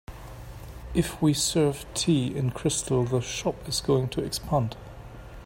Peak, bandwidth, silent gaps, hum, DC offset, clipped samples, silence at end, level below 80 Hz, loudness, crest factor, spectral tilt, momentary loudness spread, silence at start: -10 dBFS; 16.5 kHz; none; none; under 0.1%; under 0.1%; 0 s; -44 dBFS; -26 LUFS; 16 dB; -5 dB/octave; 19 LU; 0.1 s